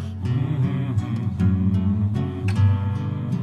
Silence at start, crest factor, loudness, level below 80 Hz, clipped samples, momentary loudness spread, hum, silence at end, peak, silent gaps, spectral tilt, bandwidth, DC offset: 0 s; 12 dB; -23 LUFS; -52 dBFS; under 0.1%; 6 LU; none; 0 s; -10 dBFS; none; -9 dB/octave; 8.4 kHz; under 0.1%